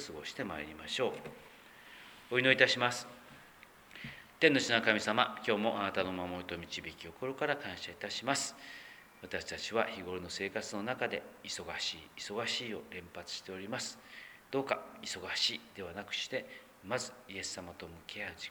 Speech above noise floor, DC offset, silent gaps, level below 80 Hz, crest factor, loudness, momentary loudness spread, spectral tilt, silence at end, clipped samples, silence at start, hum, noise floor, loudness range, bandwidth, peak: 22 dB; under 0.1%; none; -70 dBFS; 26 dB; -35 LUFS; 21 LU; -3 dB/octave; 0 s; under 0.1%; 0 s; none; -58 dBFS; 8 LU; over 20 kHz; -10 dBFS